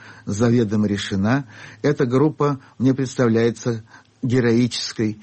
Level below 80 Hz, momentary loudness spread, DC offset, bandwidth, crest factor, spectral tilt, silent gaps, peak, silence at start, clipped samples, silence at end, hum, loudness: -54 dBFS; 9 LU; under 0.1%; 8.6 kHz; 12 dB; -6.5 dB/octave; none; -8 dBFS; 0.05 s; under 0.1%; 0 s; none; -20 LUFS